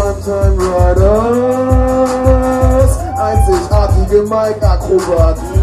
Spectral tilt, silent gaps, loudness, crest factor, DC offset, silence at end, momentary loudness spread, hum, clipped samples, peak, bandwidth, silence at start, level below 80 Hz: -7.5 dB/octave; none; -12 LUFS; 10 dB; under 0.1%; 0 s; 4 LU; none; under 0.1%; 0 dBFS; 14 kHz; 0 s; -16 dBFS